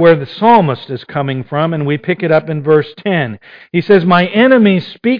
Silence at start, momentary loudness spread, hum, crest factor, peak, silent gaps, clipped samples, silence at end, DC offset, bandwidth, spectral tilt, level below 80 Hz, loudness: 0 s; 10 LU; none; 12 dB; 0 dBFS; none; under 0.1%; 0 s; under 0.1%; 5.2 kHz; -9.5 dB/octave; -52 dBFS; -12 LUFS